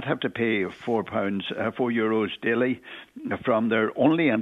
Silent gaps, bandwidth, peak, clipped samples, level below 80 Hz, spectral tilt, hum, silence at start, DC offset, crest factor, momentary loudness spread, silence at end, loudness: none; 7.2 kHz; -6 dBFS; under 0.1%; -66 dBFS; -7.5 dB/octave; none; 0 s; under 0.1%; 18 dB; 8 LU; 0 s; -25 LUFS